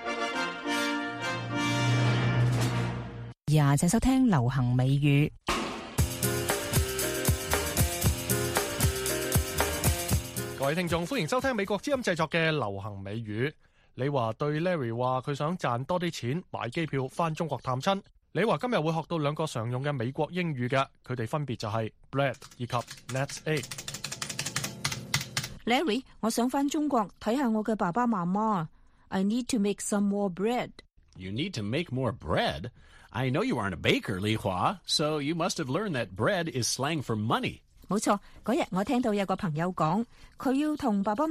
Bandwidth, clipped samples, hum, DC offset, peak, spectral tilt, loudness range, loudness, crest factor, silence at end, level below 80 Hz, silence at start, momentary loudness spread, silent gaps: 15.5 kHz; under 0.1%; none; under 0.1%; -6 dBFS; -5 dB/octave; 5 LU; -29 LUFS; 22 dB; 0 s; -46 dBFS; 0 s; 8 LU; none